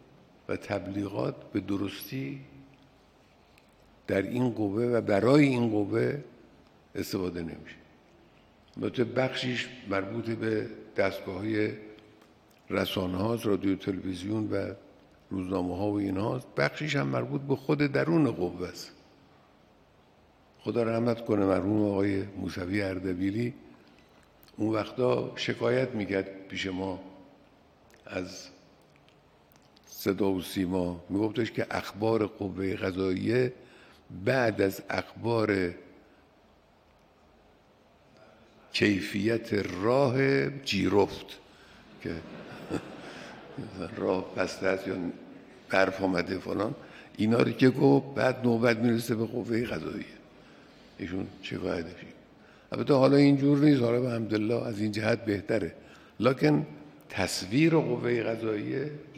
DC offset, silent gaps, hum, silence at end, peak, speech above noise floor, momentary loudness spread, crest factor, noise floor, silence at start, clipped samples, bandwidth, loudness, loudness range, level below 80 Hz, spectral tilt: under 0.1%; none; none; 0 s; -8 dBFS; 33 dB; 15 LU; 22 dB; -61 dBFS; 0.5 s; under 0.1%; 15.5 kHz; -29 LUFS; 9 LU; -66 dBFS; -6.5 dB/octave